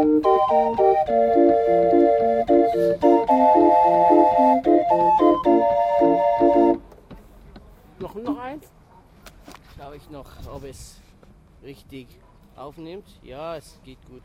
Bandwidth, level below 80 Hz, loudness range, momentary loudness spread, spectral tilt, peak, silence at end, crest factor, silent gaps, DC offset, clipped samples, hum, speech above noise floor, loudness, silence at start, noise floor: 11 kHz; -48 dBFS; 20 LU; 23 LU; -7.5 dB/octave; -4 dBFS; 0.3 s; 16 dB; none; under 0.1%; under 0.1%; none; 12 dB; -18 LUFS; 0 s; -51 dBFS